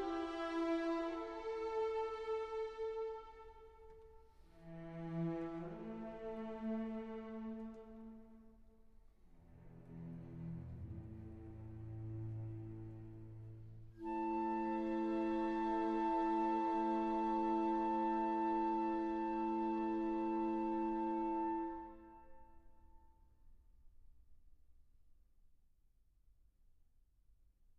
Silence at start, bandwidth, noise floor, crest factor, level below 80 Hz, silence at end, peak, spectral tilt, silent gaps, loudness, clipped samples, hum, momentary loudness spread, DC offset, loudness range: 0 s; 6.6 kHz; -72 dBFS; 16 dB; -64 dBFS; 2.25 s; -26 dBFS; -8 dB/octave; none; -40 LUFS; under 0.1%; none; 18 LU; under 0.1%; 15 LU